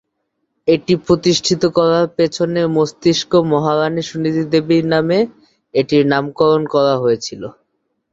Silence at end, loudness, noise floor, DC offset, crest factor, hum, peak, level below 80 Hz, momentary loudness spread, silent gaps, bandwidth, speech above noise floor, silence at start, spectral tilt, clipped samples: 0.6 s; -15 LUFS; -71 dBFS; under 0.1%; 16 dB; none; 0 dBFS; -52 dBFS; 6 LU; none; 8 kHz; 56 dB; 0.65 s; -5.5 dB/octave; under 0.1%